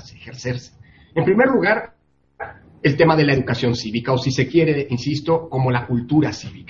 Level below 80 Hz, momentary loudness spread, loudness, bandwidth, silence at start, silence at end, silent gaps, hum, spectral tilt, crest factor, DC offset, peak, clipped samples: -50 dBFS; 16 LU; -19 LUFS; 7.6 kHz; 0.05 s; 0.05 s; none; none; -6.5 dB/octave; 18 dB; under 0.1%; -2 dBFS; under 0.1%